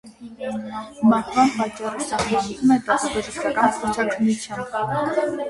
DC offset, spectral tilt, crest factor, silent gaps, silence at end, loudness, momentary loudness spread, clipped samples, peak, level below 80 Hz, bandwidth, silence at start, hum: under 0.1%; -4.5 dB/octave; 18 dB; none; 0 s; -22 LUFS; 11 LU; under 0.1%; -4 dBFS; -52 dBFS; 11.5 kHz; 0.05 s; none